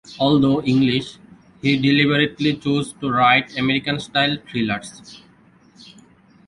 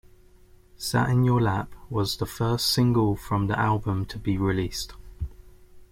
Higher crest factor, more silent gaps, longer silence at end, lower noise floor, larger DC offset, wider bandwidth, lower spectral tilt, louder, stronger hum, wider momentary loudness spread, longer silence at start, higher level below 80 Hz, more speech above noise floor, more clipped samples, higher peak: about the same, 18 dB vs 16 dB; neither; first, 0.65 s vs 0.05 s; about the same, -52 dBFS vs -53 dBFS; neither; second, 11 kHz vs 16.5 kHz; about the same, -6 dB/octave vs -5.5 dB/octave; first, -19 LUFS vs -25 LUFS; neither; second, 9 LU vs 14 LU; second, 0.1 s vs 0.8 s; second, -54 dBFS vs -44 dBFS; first, 33 dB vs 29 dB; neither; first, -2 dBFS vs -10 dBFS